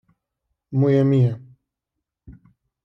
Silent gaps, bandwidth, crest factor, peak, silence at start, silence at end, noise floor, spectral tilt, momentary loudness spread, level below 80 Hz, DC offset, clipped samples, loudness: none; 5.8 kHz; 16 dB; -8 dBFS; 0.7 s; 0.55 s; -83 dBFS; -10.5 dB/octave; 12 LU; -58 dBFS; under 0.1%; under 0.1%; -19 LUFS